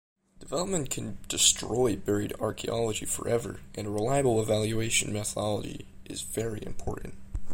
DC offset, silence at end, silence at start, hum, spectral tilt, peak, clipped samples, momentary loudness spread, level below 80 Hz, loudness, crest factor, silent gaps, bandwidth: under 0.1%; 0 s; 0.4 s; none; -3.5 dB/octave; -6 dBFS; under 0.1%; 14 LU; -46 dBFS; -29 LUFS; 24 dB; none; 16.5 kHz